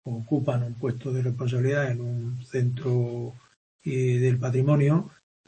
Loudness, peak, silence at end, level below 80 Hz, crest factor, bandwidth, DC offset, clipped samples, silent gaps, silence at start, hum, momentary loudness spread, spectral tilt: -26 LUFS; -10 dBFS; 0.4 s; -64 dBFS; 16 dB; 8.6 kHz; under 0.1%; under 0.1%; 3.56-3.79 s; 0.05 s; none; 9 LU; -8.5 dB/octave